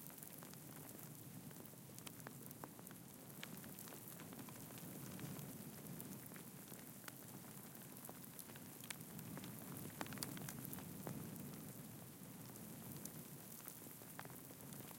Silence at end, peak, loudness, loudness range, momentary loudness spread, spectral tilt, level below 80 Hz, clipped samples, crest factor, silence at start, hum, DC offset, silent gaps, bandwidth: 0 s; -24 dBFS; -53 LUFS; 4 LU; 5 LU; -4 dB/octave; -80 dBFS; under 0.1%; 30 dB; 0 s; none; under 0.1%; none; 17 kHz